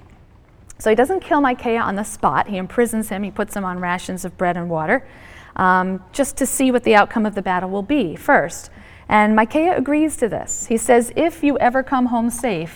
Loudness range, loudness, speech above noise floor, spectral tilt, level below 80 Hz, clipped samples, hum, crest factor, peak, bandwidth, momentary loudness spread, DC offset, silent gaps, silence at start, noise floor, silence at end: 4 LU; -18 LUFS; 29 dB; -4.5 dB/octave; -44 dBFS; under 0.1%; none; 18 dB; 0 dBFS; 19 kHz; 9 LU; under 0.1%; none; 0.7 s; -47 dBFS; 0 s